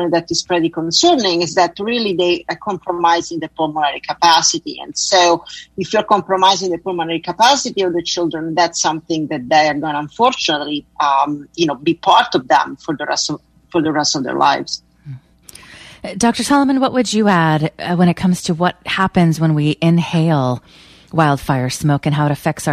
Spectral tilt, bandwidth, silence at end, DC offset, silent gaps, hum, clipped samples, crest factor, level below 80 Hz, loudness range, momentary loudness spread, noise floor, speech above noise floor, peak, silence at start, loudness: -4.5 dB/octave; 14.5 kHz; 0 s; under 0.1%; none; none; under 0.1%; 16 dB; -50 dBFS; 2 LU; 10 LU; -42 dBFS; 26 dB; 0 dBFS; 0 s; -16 LUFS